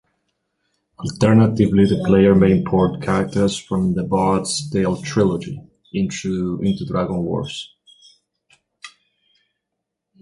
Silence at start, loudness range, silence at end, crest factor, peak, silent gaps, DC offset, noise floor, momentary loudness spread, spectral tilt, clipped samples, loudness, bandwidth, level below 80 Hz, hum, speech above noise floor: 1 s; 10 LU; 1.35 s; 18 dB; -2 dBFS; none; under 0.1%; -80 dBFS; 15 LU; -6.5 dB/octave; under 0.1%; -18 LUFS; 11.5 kHz; -44 dBFS; none; 62 dB